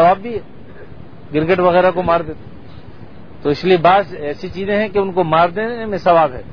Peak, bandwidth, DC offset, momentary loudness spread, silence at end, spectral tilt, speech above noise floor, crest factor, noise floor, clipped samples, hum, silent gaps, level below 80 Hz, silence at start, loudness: 0 dBFS; 5.4 kHz; 2%; 13 LU; 0 s; -8 dB/octave; 23 dB; 16 dB; -38 dBFS; under 0.1%; none; none; -44 dBFS; 0 s; -16 LUFS